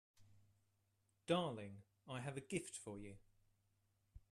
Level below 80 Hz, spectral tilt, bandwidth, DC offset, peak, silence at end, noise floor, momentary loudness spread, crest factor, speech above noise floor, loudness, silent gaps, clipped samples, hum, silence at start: -74 dBFS; -5 dB/octave; 13 kHz; under 0.1%; -26 dBFS; 0.15 s; -83 dBFS; 19 LU; 24 dB; 37 dB; -46 LUFS; none; under 0.1%; none; 0.2 s